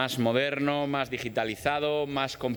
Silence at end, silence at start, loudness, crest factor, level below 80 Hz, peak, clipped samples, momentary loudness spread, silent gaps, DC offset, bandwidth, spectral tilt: 0 s; 0 s; -28 LUFS; 18 dB; -60 dBFS; -10 dBFS; under 0.1%; 4 LU; none; under 0.1%; 19.5 kHz; -5 dB/octave